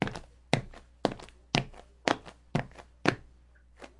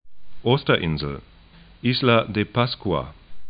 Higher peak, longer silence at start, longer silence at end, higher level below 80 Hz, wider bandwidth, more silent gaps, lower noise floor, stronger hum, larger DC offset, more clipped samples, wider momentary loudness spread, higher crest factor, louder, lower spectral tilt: about the same, -4 dBFS vs -4 dBFS; about the same, 0 s vs 0.05 s; about the same, 0.1 s vs 0 s; second, -54 dBFS vs -44 dBFS; first, 11.5 kHz vs 5.2 kHz; neither; first, -58 dBFS vs -49 dBFS; neither; neither; neither; first, 16 LU vs 11 LU; first, 32 dB vs 20 dB; second, -33 LUFS vs -22 LUFS; second, -5 dB/octave vs -11 dB/octave